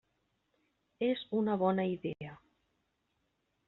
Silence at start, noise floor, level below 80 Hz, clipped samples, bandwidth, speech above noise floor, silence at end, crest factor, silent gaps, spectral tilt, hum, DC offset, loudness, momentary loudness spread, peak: 1 s; -80 dBFS; -74 dBFS; under 0.1%; 4.2 kHz; 47 dB; 1.3 s; 20 dB; none; -5.5 dB/octave; none; under 0.1%; -34 LUFS; 13 LU; -18 dBFS